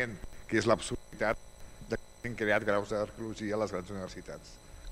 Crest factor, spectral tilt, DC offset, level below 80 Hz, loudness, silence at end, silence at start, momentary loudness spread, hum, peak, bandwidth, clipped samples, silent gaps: 22 dB; -5 dB/octave; under 0.1%; -52 dBFS; -34 LUFS; 0 s; 0 s; 19 LU; none; -12 dBFS; 16 kHz; under 0.1%; none